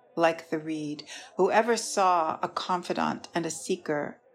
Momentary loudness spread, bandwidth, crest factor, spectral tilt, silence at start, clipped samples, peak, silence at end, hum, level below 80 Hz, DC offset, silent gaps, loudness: 10 LU; 15 kHz; 18 dB; -4 dB/octave; 0.15 s; under 0.1%; -10 dBFS; 0.2 s; none; -78 dBFS; under 0.1%; none; -28 LUFS